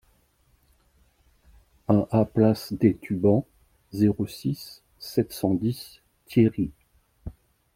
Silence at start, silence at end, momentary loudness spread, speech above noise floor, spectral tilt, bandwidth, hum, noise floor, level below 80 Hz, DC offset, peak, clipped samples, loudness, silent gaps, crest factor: 1.9 s; 0.45 s; 22 LU; 41 dB; -8 dB/octave; 16.5 kHz; none; -64 dBFS; -54 dBFS; under 0.1%; -4 dBFS; under 0.1%; -25 LUFS; none; 22 dB